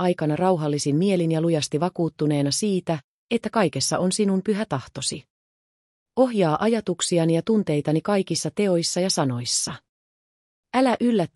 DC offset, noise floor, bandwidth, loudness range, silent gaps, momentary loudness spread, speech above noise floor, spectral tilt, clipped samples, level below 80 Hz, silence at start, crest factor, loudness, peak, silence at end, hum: under 0.1%; under -90 dBFS; 13.5 kHz; 2 LU; 3.04-3.29 s, 5.30-6.06 s, 9.89-10.63 s; 7 LU; over 68 dB; -5 dB/octave; under 0.1%; -64 dBFS; 0 s; 16 dB; -23 LUFS; -8 dBFS; 0.1 s; none